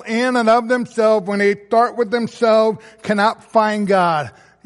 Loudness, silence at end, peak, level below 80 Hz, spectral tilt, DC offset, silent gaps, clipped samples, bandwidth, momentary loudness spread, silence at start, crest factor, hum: -17 LUFS; 0.35 s; -2 dBFS; -64 dBFS; -5.5 dB/octave; under 0.1%; none; under 0.1%; 11.5 kHz; 6 LU; 0 s; 14 dB; none